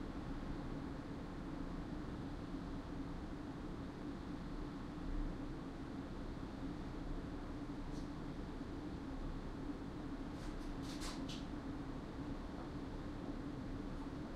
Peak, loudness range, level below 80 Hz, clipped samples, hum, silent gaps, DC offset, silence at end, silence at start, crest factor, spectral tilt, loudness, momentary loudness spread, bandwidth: -30 dBFS; 1 LU; -50 dBFS; under 0.1%; none; none; under 0.1%; 0 s; 0 s; 16 dB; -6.5 dB/octave; -48 LUFS; 2 LU; 12.5 kHz